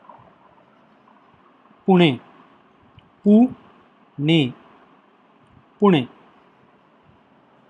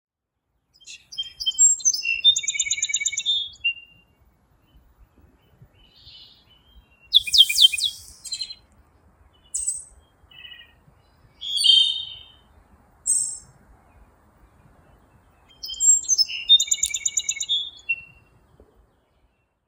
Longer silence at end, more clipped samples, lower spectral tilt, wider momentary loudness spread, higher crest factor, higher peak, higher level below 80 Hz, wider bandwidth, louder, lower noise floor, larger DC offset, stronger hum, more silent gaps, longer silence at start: about the same, 1.65 s vs 1.65 s; neither; first, -8 dB/octave vs 4 dB/octave; about the same, 18 LU vs 20 LU; about the same, 22 dB vs 24 dB; about the same, 0 dBFS vs 0 dBFS; second, -68 dBFS vs -60 dBFS; second, 8.8 kHz vs 17.5 kHz; about the same, -19 LUFS vs -19 LUFS; second, -55 dBFS vs -77 dBFS; neither; neither; neither; first, 1.85 s vs 0.85 s